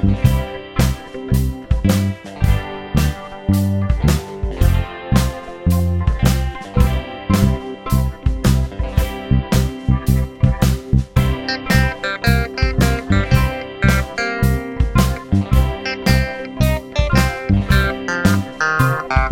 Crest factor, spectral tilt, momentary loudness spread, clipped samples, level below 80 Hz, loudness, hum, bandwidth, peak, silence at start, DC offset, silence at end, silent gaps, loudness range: 16 dB; -6 dB/octave; 5 LU; under 0.1%; -22 dBFS; -18 LUFS; none; 17 kHz; 0 dBFS; 0 s; under 0.1%; 0 s; none; 2 LU